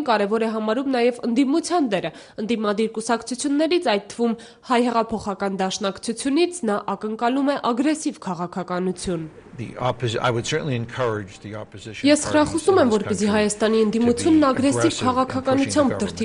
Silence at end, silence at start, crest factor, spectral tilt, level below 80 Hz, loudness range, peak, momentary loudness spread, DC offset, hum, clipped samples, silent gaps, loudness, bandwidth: 0 s; 0 s; 18 dB; -5 dB/octave; -52 dBFS; 6 LU; -4 dBFS; 10 LU; under 0.1%; none; under 0.1%; none; -21 LUFS; 11 kHz